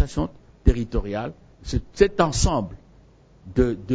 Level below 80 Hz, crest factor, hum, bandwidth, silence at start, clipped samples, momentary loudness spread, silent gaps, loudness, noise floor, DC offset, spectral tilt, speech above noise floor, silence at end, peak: -30 dBFS; 22 dB; none; 8 kHz; 0 s; under 0.1%; 12 LU; none; -24 LUFS; -52 dBFS; under 0.1%; -5.5 dB/octave; 30 dB; 0 s; -2 dBFS